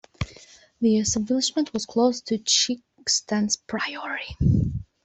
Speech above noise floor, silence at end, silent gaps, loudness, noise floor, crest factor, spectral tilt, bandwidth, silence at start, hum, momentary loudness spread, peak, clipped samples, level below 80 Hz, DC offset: 27 dB; 0.2 s; none; -24 LUFS; -51 dBFS; 18 dB; -4 dB/octave; 8.4 kHz; 0.2 s; none; 10 LU; -6 dBFS; under 0.1%; -44 dBFS; under 0.1%